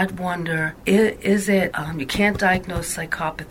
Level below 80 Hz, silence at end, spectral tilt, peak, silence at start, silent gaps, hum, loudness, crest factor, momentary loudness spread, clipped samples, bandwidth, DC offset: -42 dBFS; 0 s; -5 dB/octave; -4 dBFS; 0 s; none; none; -21 LUFS; 18 dB; 8 LU; under 0.1%; 16.5 kHz; under 0.1%